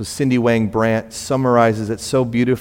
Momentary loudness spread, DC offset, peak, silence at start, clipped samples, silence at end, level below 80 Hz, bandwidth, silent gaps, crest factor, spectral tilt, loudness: 7 LU; under 0.1%; -2 dBFS; 0 s; under 0.1%; 0 s; -48 dBFS; 16.5 kHz; none; 16 dB; -6 dB/octave; -17 LUFS